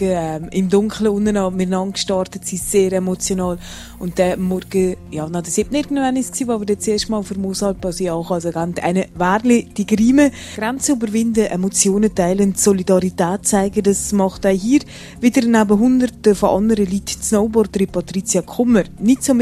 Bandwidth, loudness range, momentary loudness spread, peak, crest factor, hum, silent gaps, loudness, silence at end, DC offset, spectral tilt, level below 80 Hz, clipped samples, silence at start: 14 kHz; 4 LU; 8 LU; 0 dBFS; 16 dB; none; none; -17 LUFS; 0 s; under 0.1%; -5 dB/octave; -40 dBFS; under 0.1%; 0 s